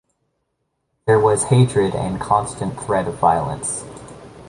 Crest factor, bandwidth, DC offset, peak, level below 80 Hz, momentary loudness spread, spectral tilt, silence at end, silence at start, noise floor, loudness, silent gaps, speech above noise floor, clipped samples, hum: 18 dB; 11.5 kHz; under 0.1%; -2 dBFS; -46 dBFS; 13 LU; -5.5 dB/octave; 0 s; 1.05 s; -73 dBFS; -19 LUFS; none; 55 dB; under 0.1%; none